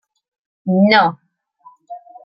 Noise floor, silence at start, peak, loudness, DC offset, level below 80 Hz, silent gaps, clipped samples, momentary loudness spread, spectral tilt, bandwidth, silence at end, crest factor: -49 dBFS; 0.65 s; -2 dBFS; -14 LUFS; under 0.1%; -66 dBFS; none; under 0.1%; 25 LU; -9 dB/octave; 5.8 kHz; 0.25 s; 18 dB